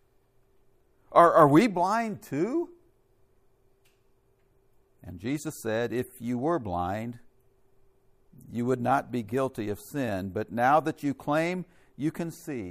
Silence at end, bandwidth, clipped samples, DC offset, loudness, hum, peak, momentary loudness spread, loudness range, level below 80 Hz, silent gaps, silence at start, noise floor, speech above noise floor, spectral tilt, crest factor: 0 s; 15.5 kHz; under 0.1%; under 0.1%; -27 LUFS; none; -4 dBFS; 16 LU; 12 LU; -64 dBFS; none; 1.1 s; -65 dBFS; 39 dB; -6.5 dB/octave; 24 dB